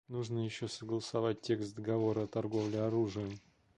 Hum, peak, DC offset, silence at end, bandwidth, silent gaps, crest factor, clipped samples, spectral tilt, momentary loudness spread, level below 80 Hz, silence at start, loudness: none; -20 dBFS; under 0.1%; 0.4 s; 10.5 kHz; none; 16 dB; under 0.1%; -6.5 dB/octave; 7 LU; -68 dBFS; 0.1 s; -36 LUFS